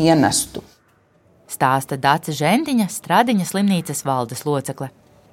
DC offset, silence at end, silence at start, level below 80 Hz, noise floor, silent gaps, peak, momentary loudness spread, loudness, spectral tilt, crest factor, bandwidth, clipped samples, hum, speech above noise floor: under 0.1%; 0.45 s; 0 s; -56 dBFS; -57 dBFS; none; 0 dBFS; 13 LU; -19 LUFS; -4.5 dB/octave; 18 dB; 17 kHz; under 0.1%; none; 39 dB